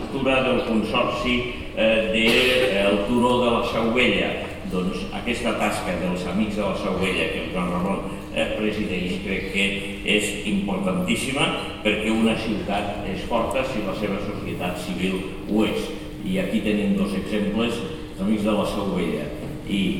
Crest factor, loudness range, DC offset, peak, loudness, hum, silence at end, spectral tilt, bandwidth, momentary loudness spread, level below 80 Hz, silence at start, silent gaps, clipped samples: 20 dB; 5 LU; 0.4%; -4 dBFS; -23 LUFS; none; 0 s; -5 dB/octave; 16.5 kHz; 9 LU; -40 dBFS; 0 s; none; under 0.1%